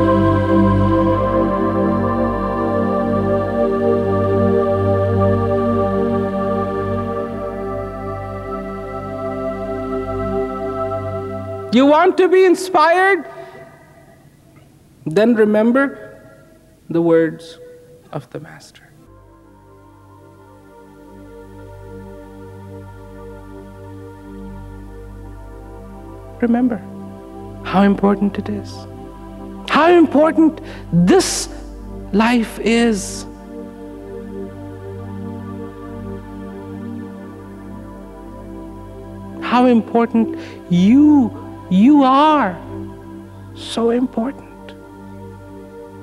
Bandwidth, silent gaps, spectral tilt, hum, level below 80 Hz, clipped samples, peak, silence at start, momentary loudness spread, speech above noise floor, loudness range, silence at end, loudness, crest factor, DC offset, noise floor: 13 kHz; none; -6.5 dB/octave; 50 Hz at -45 dBFS; -40 dBFS; under 0.1%; -2 dBFS; 0 s; 24 LU; 33 dB; 21 LU; 0 s; -16 LUFS; 16 dB; under 0.1%; -47 dBFS